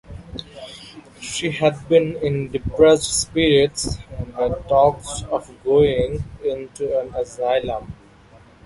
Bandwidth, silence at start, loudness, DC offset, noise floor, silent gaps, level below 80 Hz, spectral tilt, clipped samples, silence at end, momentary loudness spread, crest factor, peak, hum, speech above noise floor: 11.5 kHz; 0.1 s; -20 LUFS; under 0.1%; -48 dBFS; none; -40 dBFS; -4.5 dB/octave; under 0.1%; 0.7 s; 19 LU; 18 dB; -2 dBFS; none; 29 dB